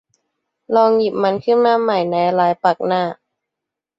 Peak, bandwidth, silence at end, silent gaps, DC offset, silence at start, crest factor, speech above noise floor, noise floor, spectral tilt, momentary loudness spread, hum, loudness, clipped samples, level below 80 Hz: -2 dBFS; 7.6 kHz; 0.85 s; none; under 0.1%; 0.7 s; 16 dB; 68 dB; -83 dBFS; -7.5 dB/octave; 5 LU; none; -16 LUFS; under 0.1%; -64 dBFS